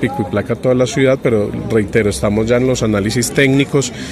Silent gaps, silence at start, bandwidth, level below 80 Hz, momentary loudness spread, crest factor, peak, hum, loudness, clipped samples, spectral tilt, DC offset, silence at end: none; 0 s; 14.5 kHz; -36 dBFS; 5 LU; 14 dB; 0 dBFS; none; -15 LUFS; under 0.1%; -5.5 dB/octave; under 0.1%; 0 s